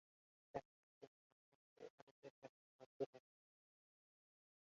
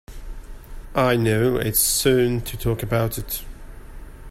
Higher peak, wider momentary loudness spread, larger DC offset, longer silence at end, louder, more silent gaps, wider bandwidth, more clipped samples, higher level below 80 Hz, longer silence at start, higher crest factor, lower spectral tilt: second, -32 dBFS vs -6 dBFS; second, 16 LU vs 23 LU; neither; first, 1.5 s vs 0 s; second, -57 LUFS vs -21 LUFS; first, 0.65-1.01 s, 1.07-1.76 s, 1.90-2.22 s, 2.30-2.42 s, 2.49-2.79 s, 2.86-3.00 s, 3.06-3.13 s vs none; second, 7.2 kHz vs 16 kHz; neither; second, under -90 dBFS vs -36 dBFS; first, 0.55 s vs 0.1 s; first, 28 dB vs 18 dB; about the same, -5.5 dB/octave vs -4.5 dB/octave